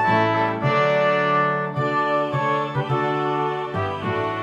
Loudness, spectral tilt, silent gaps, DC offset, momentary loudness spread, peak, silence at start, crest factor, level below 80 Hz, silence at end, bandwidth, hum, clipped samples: -21 LUFS; -7 dB/octave; none; under 0.1%; 6 LU; -8 dBFS; 0 s; 14 dB; -60 dBFS; 0 s; 8.4 kHz; none; under 0.1%